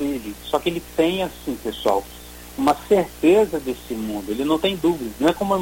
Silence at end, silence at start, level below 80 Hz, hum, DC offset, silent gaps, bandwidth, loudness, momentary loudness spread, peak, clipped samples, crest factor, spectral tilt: 0 s; 0 s; -44 dBFS; 60 Hz at -45 dBFS; under 0.1%; none; 17 kHz; -22 LUFS; 11 LU; -4 dBFS; under 0.1%; 18 dB; -5 dB/octave